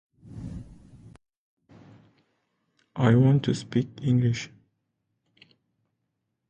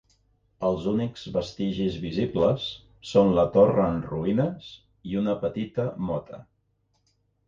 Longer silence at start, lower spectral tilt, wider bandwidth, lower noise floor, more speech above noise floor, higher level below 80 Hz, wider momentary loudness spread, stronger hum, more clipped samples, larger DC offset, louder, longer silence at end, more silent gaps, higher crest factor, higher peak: second, 0.3 s vs 0.6 s; about the same, -7.5 dB/octave vs -8 dB/octave; first, 8.8 kHz vs 7.6 kHz; first, -79 dBFS vs -71 dBFS; first, 57 dB vs 46 dB; second, -56 dBFS vs -50 dBFS; first, 22 LU vs 15 LU; neither; neither; neither; about the same, -24 LUFS vs -26 LUFS; first, 2 s vs 1.05 s; first, 1.37-1.57 s vs none; about the same, 22 dB vs 20 dB; about the same, -6 dBFS vs -6 dBFS